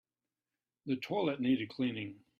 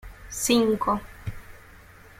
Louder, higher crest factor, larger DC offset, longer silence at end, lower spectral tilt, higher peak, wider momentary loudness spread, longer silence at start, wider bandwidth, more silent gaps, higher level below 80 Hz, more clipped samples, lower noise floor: second, -35 LUFS vs -24 LUFS; about the same, 16 dB vs 20 dB; neither; second, 0.2 s vs 0.4 s; first, -7.5 dB/octave vs -4 dB/octave; second, -20 dBFS vs -8 dBFS; second, 9 LU vs 18 LU; first, 0.85 s vs 0.05 s; second, 7.2 kHz vs 16.5 kHz; neither; second, -76 dBFS vs -46 dBFS; neither; first, under -90 dBFS vs -49 dBFS